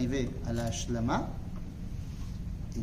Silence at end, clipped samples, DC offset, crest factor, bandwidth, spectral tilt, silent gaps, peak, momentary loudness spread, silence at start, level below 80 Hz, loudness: 0 s; under 0.1%; under 0.1%; 14 dB; 15 kHz; -6 dB/octave; none; -18 dBFS; 10 LU; 0 s; -40 dBFS; -35 LUFS